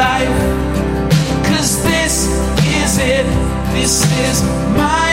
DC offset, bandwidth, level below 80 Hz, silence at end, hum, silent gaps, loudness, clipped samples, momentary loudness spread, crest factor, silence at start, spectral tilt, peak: under 0.1%; 16.5 kHz; -24 dBFS; 0 s; none; none; -14 LUFS; under 0.1%; 4 LU; 12 dB; 0 s; -4 dB/octave; -2 dBFS